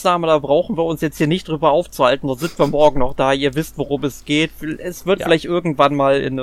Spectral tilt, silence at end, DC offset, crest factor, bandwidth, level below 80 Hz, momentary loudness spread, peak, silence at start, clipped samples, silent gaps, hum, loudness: -5.5 dB/octave; 0 s; under 0.1%; 16 dB; 15.5 kHz; -38 dBFS; 8 LU; 0 dBFS; 0 s; under 0.1%; none; none; -18 LUFS